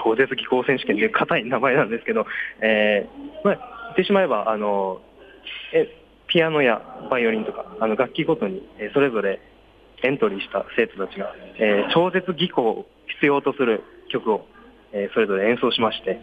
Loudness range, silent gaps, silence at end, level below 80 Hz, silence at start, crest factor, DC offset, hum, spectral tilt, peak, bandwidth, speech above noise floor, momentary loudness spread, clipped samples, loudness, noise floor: 3 LU; none; 0 s; -60 dBFS; 0 s; 16 dB; under 0.1%; none; -7.5 dB/octave; -6 dBFS; 5 kHz; 28 dB; 10 LU; under 0.1%; -22 LUFS; -50 dBFS